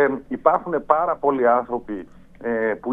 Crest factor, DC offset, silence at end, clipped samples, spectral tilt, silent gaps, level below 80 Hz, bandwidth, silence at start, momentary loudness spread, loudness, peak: 22 dB; under 0.1%; 0 s; under 0.1%; -9 dB/octave; none; -54 dBFS; 3.8 kHz; 0 s; 12 LU; -21 LUFS; 0 dBFS